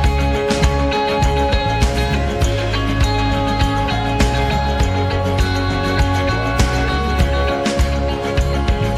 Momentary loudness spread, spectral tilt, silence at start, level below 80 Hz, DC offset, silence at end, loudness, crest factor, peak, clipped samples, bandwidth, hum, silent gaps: 2 LU; -5.5 dB/octave; 0 s; -20 dBFS; under 0.1%; 0 s; -17 LUFS; 14 dB; -2 dBFS; under 0.1%; 14 kHz; none; none